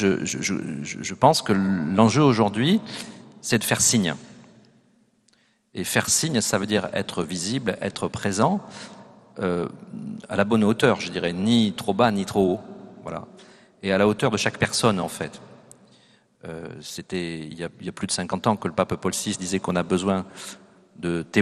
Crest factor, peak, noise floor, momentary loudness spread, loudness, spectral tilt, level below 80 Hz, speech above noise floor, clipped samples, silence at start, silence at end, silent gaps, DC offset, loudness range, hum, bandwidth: 22 dB; -2 dBFS; -63 dBFS; 17 LU; -23 LUFS; -4.5 dB/octave; -58 dBFS; 40 dB; under 0.1%; 0 s; 0 s; none; under 0.1%; 6 LU; none; 13 kHz